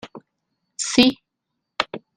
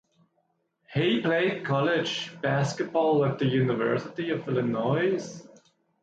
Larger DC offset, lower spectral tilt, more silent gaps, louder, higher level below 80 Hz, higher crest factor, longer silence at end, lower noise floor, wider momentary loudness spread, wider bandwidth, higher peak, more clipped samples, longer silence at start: neither; second, -2.5 dB/octave vs -6 dB/octave; neither; first, -20 LUFS vs -26 LUFS; first, -58 dBFS vs -68 dBFS; first, 24 dB vs 14 dB; second, 0.2 s vs 0.55 s; first, -80 dBFS vs -73 dBFS; first, 24 LU vs 7 LU; first, 14 kHz vs 9 kHz; first, 0 dBFS vs -12 dBFS; neither; second, 0.05 s vs 0.9 s